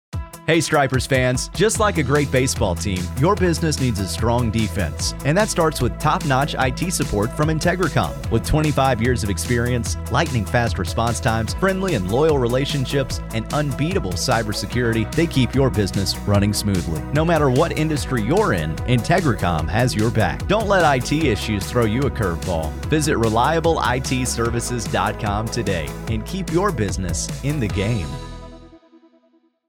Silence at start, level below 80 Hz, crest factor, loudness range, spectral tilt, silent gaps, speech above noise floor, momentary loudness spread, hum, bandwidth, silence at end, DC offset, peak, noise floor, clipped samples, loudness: 0.15 s; -32 dBFS; 16 dB; 3 LU; -5 dB/octave; none; 41 dB; 6 LU; none; 18 kHz; 0.9 s; under 0.1%; -4 dBFS; -60 dBFS; under 0.1%; -20 LUFS